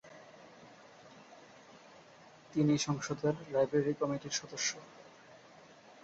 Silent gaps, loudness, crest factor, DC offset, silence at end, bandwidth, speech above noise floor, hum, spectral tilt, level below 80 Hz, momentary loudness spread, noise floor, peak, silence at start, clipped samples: none; -34 LUFS; 18 dB; under 0.1%; 0.3 s; 8.2 kHz; 25 dB; none; -4.5 dB/octave; -72 dBFS; 26 LU; -58 dBFS; -18 dBFS; 0.05 s; under 0.1%